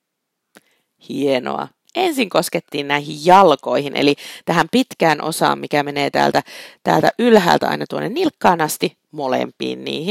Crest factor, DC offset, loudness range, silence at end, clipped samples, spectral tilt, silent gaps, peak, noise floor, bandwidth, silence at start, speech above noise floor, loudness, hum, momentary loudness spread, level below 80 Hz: 18 dB; under 0.1%; 2 LU; 0 s; under 0.1%; -4.5 dB/octave; none; 0 dBFS; -77 dBFS; 16.5 kHz; 1.1 s; 59 dB; -17 LUFS; none; 12 LU; -60 dBFS